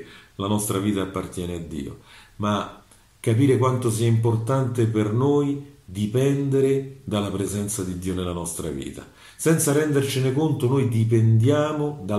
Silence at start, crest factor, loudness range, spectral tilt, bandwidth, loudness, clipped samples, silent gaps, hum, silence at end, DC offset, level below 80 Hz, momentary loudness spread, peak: 0 s; 16 dB; 4 LU; -6.5 dB/octave; 14.5 kHz; -23 LUFS; under 0.1%; none; none; 0 s; under 0.1%; -52 dBFS; 12 LU; -6 dBFS